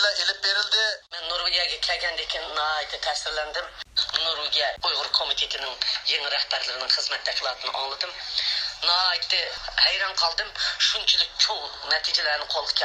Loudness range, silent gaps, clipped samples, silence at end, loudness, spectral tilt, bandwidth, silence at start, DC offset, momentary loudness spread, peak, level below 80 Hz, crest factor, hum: 4 LU; none; under 0.1%; 0 s; -23 LUFS; 1.5 dB/octave; 16 kHz; 0 s; under 0.1%; 7 LU; -4 dBFS; -54 dBFS; 22 dB; none